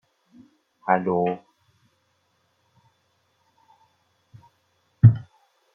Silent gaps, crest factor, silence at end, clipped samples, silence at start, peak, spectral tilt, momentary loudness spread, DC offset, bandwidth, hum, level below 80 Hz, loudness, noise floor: none; 24 dB; 0.55 s; under 0.1%; 0.85 s; -2 dBFS; -11 dB/octave; 18 LU; under 0.1%; 3.4 kHz; none; -54 dBFS; -22 LUFS; -69 dBFS